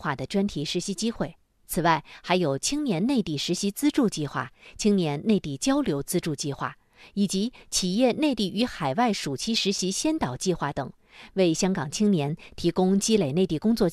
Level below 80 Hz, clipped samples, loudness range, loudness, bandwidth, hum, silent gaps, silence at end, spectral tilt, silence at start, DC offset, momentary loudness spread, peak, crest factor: -52 dBFS; under 0.1%; 2 LU; -26 LUFS; 13.5 kHz; none; none; 0 s; -4.5 dB/octave; 0 s; under 0.1%; 8 LU; -6 dBFS; 20 dB